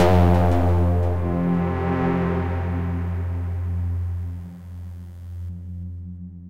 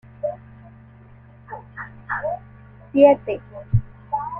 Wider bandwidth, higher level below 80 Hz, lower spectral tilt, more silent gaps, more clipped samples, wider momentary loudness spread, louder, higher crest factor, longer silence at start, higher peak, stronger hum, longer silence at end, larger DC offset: first, 6.4 kHz vs 3.4 kHz; first, -34 dBFS vs -42 dBFS; second, -9 dB/octave vs -10.5 dB/octave; neither; neither; second, 18 LU vs 23 LU; about the same, -23 LUFS vs -22 LUFS; second, 16 dB vs 22 dB; second, 0 s vs 0.25 s; second, -6 dBFS vs -2 dBFS; neither; about the same, 0 s vs 0 s; neither